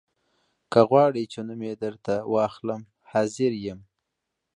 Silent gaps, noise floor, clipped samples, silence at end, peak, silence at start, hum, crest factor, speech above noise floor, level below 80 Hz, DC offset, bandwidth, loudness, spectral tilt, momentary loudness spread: none; -82 dBFS; under 0.1%; 0.75 s; -4 dBFS; 0.7 s; none; 22 dB; 58 dB; -64 dBFS; under 0.1%; 10.5 kHz; -25 LUFS; -6.5 dB/octave; 15 LU